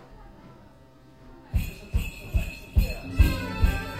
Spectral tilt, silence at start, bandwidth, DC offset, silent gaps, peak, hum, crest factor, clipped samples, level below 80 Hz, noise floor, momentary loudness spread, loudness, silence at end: -6 dB/octave; 0 s; 15.5 kHz; 0.1%; none; -6 dBFS; none; 22 dB; under 0.1%; -28 dBFS; -53 dBFS; 25 LU; -28 LUFS; 0 s